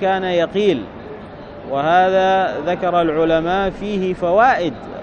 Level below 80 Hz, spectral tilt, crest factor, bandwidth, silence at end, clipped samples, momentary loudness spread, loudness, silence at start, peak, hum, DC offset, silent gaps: -44 dBFS; -6.5 dB/octave; 16 dB; 8.4 kHz; 0 s; under 0.1%; 19 LU; -17 LUFS; 0 s; -2 dBFS; none; under 0.1%; none